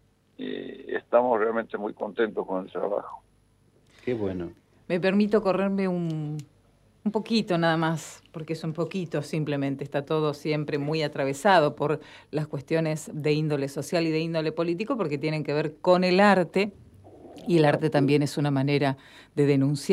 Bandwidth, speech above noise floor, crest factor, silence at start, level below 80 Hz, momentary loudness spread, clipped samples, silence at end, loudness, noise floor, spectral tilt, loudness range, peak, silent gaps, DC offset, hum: 14.5 kHz; 37 dB; 20 dB; 0.4 s; -66 dBFS; 13 LU; under 0.1%; 0 s; -26 LUFS; -62 dBFS; -6.5 dB/octave; 5 LU; -6 dBFS; none; under 0.1%; none